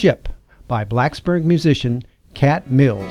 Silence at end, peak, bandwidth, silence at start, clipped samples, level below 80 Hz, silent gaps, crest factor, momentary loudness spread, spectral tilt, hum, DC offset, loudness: 0 s; 0 dBFS; 11 kHz; 0 s; under 0.1%; -38 dBFS; none; 16 dB; 11 LU; -7.5 dB/octave; none; under 0.1%; -18 LUFS